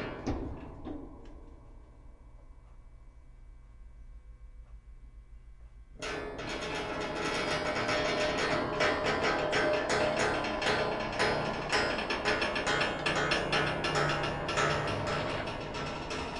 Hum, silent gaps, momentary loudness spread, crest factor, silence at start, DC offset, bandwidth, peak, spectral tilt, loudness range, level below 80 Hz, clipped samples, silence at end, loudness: none; none; 9 LU; 18 dB; 0 s; under 0.1%; 11.5 kHz; -14 dBFS; -4 dB/octave; 15 LU; -50 dBFS; under 0.1%; 0 s; -31 LUFS